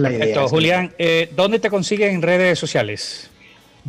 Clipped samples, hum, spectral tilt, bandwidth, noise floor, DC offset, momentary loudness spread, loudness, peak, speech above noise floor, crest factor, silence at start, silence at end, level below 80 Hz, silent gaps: under 0.1%; none; -5 dB/octave; 15 kHz; -48 dBFS; under 0.1%; 8 LU; -17 LUFS; -6 dBFS; 30 dB; 12 dB; 0 s; 0 s; -58 dBFS; none